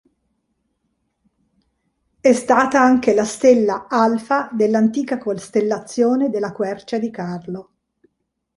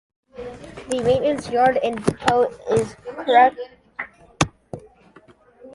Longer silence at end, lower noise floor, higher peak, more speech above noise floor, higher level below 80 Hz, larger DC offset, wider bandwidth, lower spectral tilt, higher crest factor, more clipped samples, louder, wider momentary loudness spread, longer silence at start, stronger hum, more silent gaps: first, 0.95 s vs 0.05 s; first, -74 dBFS vs -51 dBFS; about the same, -2 dBFS vs -2 dBFS; first, 57 dB vs 32 dB; second, -60 dBFS vs -50 dBFS; neither; about the same, 11.5 kHz vs 11.5 kHz; about the same, -5.5 dB/octave vs -5 dB/octave; about the same, 18 dB vs 20 dB; neither; about the same, -18 LUFS vs -20 LUFS; second, 11 LU vs 21 LU; first, 2.25 s vs 0.35 s; neither; neither